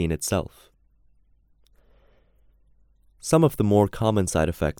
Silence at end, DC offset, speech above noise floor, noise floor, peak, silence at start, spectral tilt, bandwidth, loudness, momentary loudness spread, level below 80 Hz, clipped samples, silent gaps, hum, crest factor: 0.1 s; under 0.1%; 38 dB; -60 dBFS; -4 dBFS; 0 s; -6 dB/octave; 19.5 kHz; -23 LUFS; 9 LU; -44 dBFS; under 0.1%; none; none; 20 dB